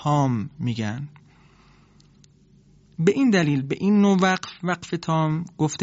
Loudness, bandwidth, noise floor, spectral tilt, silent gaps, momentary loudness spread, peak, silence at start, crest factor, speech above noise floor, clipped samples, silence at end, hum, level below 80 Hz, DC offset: -22 LUFS; 8 kHz; -55 dBFS; -6 dB/octave; none; 10 LU; -6 dBFS; 0 s; 16 dB; 33 dB; under 0.1%; 0 s; none; -60 dBFS; under 0.1%